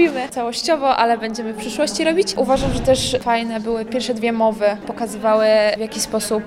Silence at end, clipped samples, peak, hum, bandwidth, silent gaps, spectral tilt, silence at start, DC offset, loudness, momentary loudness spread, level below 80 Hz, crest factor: 0 s; under 0.1%; -2 dBFS; none; 16 kHz; none; -4 dB/octave; 0 s; under 0.1%; -19 LUFS; 7 LU; -38 dBFS; 16 dB